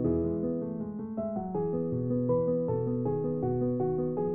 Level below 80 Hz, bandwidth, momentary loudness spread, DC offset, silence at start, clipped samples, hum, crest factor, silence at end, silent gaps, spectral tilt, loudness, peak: -54 dBFS; 2.6 kHz; 6 LU; under 0.1%; 0 s; under 0.1%; none; 14 dB; 0 s; none; -10.5 dB/octave; -31 LUFS; -16 dBFS